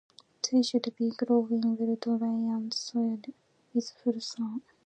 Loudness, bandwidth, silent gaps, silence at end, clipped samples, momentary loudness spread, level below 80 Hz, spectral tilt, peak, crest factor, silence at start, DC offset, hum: -30 LUFS; 9 kHz; none; 0.25 s; under 0.1%; 9 LU; -84 dBFS; -4.5 dB/octave; -12 dBFS; 18 dB; 0.45 s; under 0.1%; none